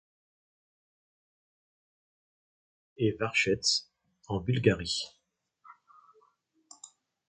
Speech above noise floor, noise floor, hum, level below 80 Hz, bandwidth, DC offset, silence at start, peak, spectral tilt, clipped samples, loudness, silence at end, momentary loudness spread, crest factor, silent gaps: 41 dB; -70 dBFS; none; -58 dBFS; 9.4 kHz; under 0.1%; 3 s; -10 dBFS; -4 dB/octave; under 0.1%; -29 LUFS; 0.45 s; 21 LU; 26 dB; none